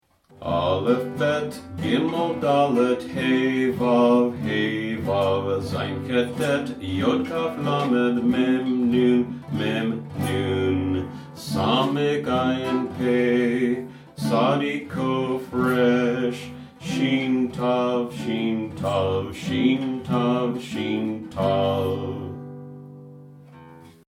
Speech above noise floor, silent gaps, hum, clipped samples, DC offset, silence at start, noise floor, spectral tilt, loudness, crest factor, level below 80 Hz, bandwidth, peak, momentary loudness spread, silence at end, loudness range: 24 dB; none; none; under 0.1%; under 0.1%; 0.4 s; -46 dBFS; -6.5 dB/octave; -23 LUFS; 16 dB; -56 dBFS; 14.5 kHz; -6 dBFS; 9 LU; 0.2 s; 3 LU